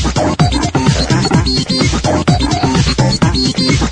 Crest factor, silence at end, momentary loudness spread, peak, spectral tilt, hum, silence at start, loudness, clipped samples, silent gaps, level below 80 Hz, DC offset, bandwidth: 12 dB; 0 s; 1 LU; 0 dBFS; -5 dB/octave; none; 0 s; -13 LUFS; under 0.1%; none; -22 dBFS; under 0.1%; 10.5 kHz